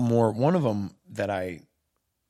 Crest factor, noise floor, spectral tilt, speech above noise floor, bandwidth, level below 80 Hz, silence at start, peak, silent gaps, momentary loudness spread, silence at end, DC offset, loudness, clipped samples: 18 dB; -77 dBFS; -8 dB/octave; 52 dB; 13.5 kHz; -68 dBFS; 0 s; -8 dBFS; none; 14 LU; 0.7 s; under 0.1%; -27 LUFS; under 0.1%